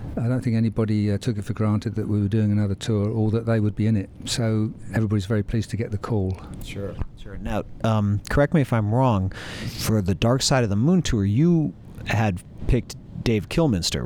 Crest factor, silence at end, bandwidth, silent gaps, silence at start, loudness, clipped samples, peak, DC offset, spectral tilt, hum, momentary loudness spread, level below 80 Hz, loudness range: 16 dB; 0 s; 16 kHz; none; 0 s; -23 LUFS; under 0.1%; -6 dBFS; under 0.1%; -6 dB/octave; none; 10 LU; -38 dBFS; 5 LU